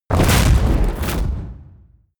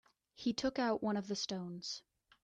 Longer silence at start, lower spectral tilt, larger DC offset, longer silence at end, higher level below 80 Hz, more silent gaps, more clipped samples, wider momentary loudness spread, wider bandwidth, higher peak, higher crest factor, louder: second, 0.1 s vs 0.4 s; about the same, -5 dB/octave vs -4.5 dB/octave; neither; about the same, 0.55 s vs 0.45 s; first, -20 dBFS vs -70 dBFS; neither; neither; first, 14 LU vs 9 LU; first, over 20 kHz vs 9.2 kHz; first, -2 dBFS vs -24 dBFS; about the same, 14 dB vs 16 dB; first, -18 LUFS vs -39 LUFS